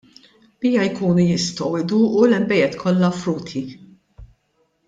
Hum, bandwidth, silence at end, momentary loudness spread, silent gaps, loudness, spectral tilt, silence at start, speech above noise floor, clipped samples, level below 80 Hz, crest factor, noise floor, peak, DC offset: none; 7.8 kHz; 0.6 s; 10 LU; none; -19 LUFS; -6 dB/octave; 0.6 s; 48 dB; under 0.1%; -54 dBFS; 16 dB; -66 dBFS; -4 dBFS; under 0.1%